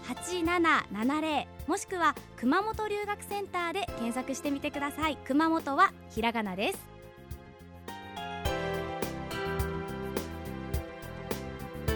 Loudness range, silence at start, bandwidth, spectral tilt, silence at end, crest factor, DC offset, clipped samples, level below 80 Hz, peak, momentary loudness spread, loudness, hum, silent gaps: 6 LU; 0 s; over 20 kHz; -4.5 dB/octave; 0 s; 20 dB; under 0.1%; under 0.1%; -48 dBFS; -12 dBFS; 15 LU; -31 LUFS; none; none